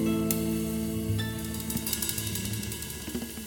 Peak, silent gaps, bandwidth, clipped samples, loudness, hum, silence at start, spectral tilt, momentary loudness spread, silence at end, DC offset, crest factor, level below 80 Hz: -6 dBFS; none; 17.5 kHz; under 0.1%; -31 LUFS; none; 0 s; -4.5 dB/octave; 7 LU; 0 s; under 0.1%; 26 dB; -46 dBFS